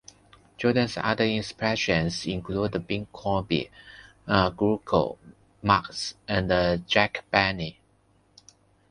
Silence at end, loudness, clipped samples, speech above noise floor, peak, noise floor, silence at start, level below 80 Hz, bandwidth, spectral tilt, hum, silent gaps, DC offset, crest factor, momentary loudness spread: 1.2 s; -26 LUFS; under 0.1%; 38 dB; -2 dBFS; -64 dBFS; 0.6 s; -48 dBFS; 11 kHz; -5.5 dB/octave; none; none; under 0.1%; 24 dB; 10 LU